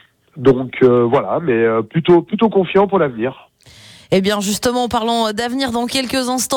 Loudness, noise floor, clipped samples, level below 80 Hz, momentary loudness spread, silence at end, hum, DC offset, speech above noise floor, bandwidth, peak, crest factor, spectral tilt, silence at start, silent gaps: -16 LUFS; -43 dBFS; under 0.1%; -48 dBFS; 5 LU; 0 s; none; under 0.1%; 28 dB; 19 kHz; -2 dBFS; 14 dB; -5 dB/octave; 0.35 s; none